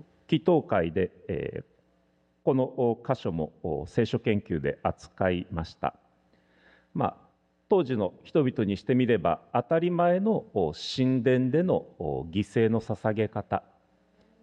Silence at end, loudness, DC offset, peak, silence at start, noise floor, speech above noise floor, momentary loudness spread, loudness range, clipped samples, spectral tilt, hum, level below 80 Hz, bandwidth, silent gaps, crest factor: 0.85 s; -28 LUFS; under 0.1%; -10 dBFS; 0.3 s; -68 dBFS; 41 dB; 9 LU; 5 LU; under 0.1%; -8 dB/octave; none; -56 dBFS; 9.2 kHz; none; 18 dB